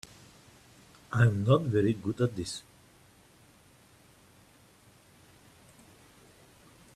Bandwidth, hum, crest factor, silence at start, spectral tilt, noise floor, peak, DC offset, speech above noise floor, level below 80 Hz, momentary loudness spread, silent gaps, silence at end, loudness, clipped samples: 13 kHz; none; 24 dB; 1.1 s; -7 dB/octave; -60 dBFS; -10 dBFS; under 0.1%; 33 dB; -62 dBFS; 15 LU; none; 4.35 s; -29 LUFS; under 0.1%